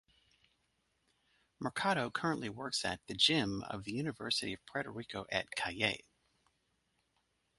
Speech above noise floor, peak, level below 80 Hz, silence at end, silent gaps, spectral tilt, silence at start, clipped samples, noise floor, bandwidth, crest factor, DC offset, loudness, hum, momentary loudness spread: 43 dB; -14 dBFS; -66 dBFS; 1.6 s; none; -3.5 dB/octave; 1.6 s; under 0.1%; -79 dBFS; 11.5 kHz; 24 dB; under 0.1%; -36 LUFS; none; 12 LU